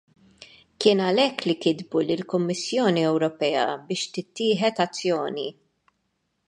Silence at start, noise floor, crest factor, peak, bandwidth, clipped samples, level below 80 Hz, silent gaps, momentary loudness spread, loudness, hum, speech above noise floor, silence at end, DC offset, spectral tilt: 0.4 s; -75 dBFS; 20 dB; -4 dBFS; 11 kHz; under 0.1%; -72 dBFS; none; 8 LU; -24 LUFS; none; 51 dB; 0.95 s; under 0.1%; -5 dB/octave